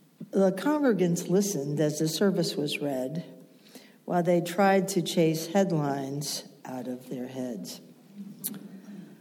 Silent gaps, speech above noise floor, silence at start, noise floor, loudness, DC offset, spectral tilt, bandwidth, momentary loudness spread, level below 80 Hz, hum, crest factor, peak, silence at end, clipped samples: none; 26 dB; 0.2 s; -52 dBFS; -28 LUFS; under 0.1%; -5.5 dB/octave; 19 kHz; 18 LU; -84 dBFS; none; 16 dB; -12 dBFS; 0.05 s; under 0.1%